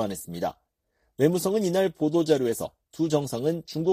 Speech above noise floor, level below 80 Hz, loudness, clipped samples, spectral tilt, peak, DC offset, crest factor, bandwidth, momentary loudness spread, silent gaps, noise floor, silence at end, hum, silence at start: 48 dB; -62 dBFS; -26 LUFS; under 0.1%; -6 dB/octave; -8 dBFS; under 0.1%; 18 dB; 15.5 kHz; 10 LU; none; -73 dBFS; 0 s; none; 0 s